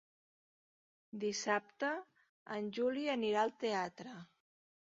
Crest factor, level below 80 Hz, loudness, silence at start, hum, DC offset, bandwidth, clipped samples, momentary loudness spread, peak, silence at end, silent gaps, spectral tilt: 20 dB; -84 dBFS; -38 LUFS; 1.15 s; none; under 0.1%; 7.4 kHz; under 0.1%; 16 LU; -20 dBFS; 0.7 s; 2.29-2.46 s; -2.5 dB/octave